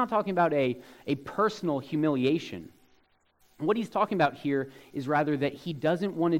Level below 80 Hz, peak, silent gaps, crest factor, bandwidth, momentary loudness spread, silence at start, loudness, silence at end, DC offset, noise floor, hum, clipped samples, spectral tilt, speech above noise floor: -68 dBFS; -10 dBFS; none; 18 dB; 16 kHz; 8 LU; 0 s; -29 LUFS; 0 s; under 0.1%; -66 dBFS; none; under 0.1%; -7 dB/octave; 38 dB